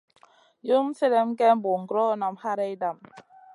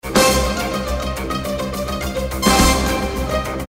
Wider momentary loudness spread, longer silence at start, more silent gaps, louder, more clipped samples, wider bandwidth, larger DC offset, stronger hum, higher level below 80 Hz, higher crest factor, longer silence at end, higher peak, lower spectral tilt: about the same, 11 LU vs 10 LU; first, 0.65 s vs 0.05 s; neither; second, -25 LUFS vs -18 LUFS; neither; second, 11 kHz vs 16.5 kHz; neither; neither; second, -84 dBFS vs -26 dBFS; about the same, 18 dB vs 16 dB; first, 0.35 s vs 0.05 s; second, -8 dBFS vs -2 dBFS; first, -6.5 dB/octave vs -4 dB/octave